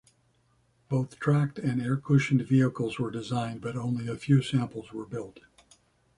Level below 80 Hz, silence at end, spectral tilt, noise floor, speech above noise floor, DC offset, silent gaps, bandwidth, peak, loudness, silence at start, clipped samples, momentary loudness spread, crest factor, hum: -62 dBFS; 0.8 s; -7.5 dB/octave; -68 dBFS; 41 dB; under 0.1%; none; 11 kHz; -10 dBFS; -28 LUFS; 0.9 s; under 0.1%; 13 LU; 18 dB; none